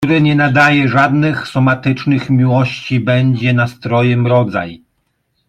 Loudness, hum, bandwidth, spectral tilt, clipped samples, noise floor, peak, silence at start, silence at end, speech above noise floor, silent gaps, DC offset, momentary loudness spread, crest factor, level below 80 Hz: -13 LUFS; none; 8.8 kHz; -7.5 dB/octave; under 0.1%; -65 dBFS; 0 dBFS; 0 s; 0.75 s; 52 dB; none; under 0.1%; 6 LU; 12 dB; -50 dBFS